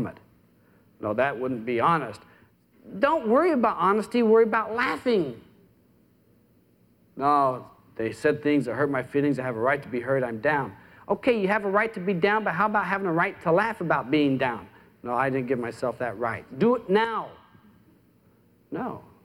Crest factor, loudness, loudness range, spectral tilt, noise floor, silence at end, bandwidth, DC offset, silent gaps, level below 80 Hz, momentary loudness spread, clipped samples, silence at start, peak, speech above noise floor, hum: 18 dB; -25 LUFS; 5 LU; -7 dB/octave; -61 dBFS; 0.25 s; 15 kHz; under 0.1%; none; -64 dBFS; 12 LU; under 0.1%; 0 s; -8 dBFS; 37 dB; none